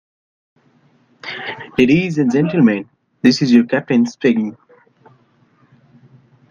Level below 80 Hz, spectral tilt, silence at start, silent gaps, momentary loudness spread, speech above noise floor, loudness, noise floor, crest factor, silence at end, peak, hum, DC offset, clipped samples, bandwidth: -56 dBFS; -6.5 dB/octave; 1.25 s; none; 14 LU; 41 dB; -16 LUFS; -55 dBFS; 18 dB; 1.95 s; 0 dBFS; none; under 0.1%; under 0.1%; 7.4 kHz